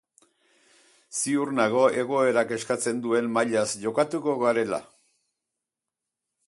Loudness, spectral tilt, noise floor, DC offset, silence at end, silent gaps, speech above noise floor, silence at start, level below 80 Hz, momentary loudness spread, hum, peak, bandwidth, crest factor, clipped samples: -25 LUFS; -4 dB/octave; -87 dBFS; under 0.1%; 1.65 s; none; 63 dB; 1.1 s; -72 dBFS; 5 LU; none; -8 dBFS; 11.5 kHz; 20 dB; under 0.1%